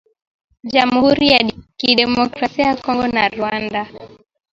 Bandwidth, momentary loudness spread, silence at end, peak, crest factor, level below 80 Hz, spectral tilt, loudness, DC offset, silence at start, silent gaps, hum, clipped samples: 7.6 kHz; 10 LU; 0.45 s; 0 dBFS; 18 dB; -48 dBFS; -5 dB/octave; -16 LUFS; under 0.1%; 0.65 s; none; none; under 0.1%